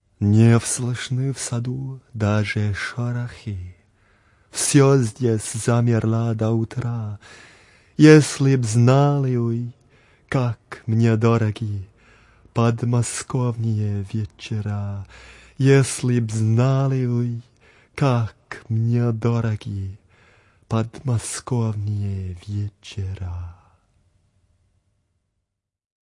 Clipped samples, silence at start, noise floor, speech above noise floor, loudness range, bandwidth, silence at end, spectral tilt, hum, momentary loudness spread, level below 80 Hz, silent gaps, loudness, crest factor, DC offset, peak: under 0.1%; 0.2 s; -78 dBFS; 59 dB; 9 LU; 11.5 kHz; 2.55 s; -6.5 dB/octave; none; 16 LU; -56 dBFS; none; -21 LUFS; 20 dB; under 0.1%; 0 dBFS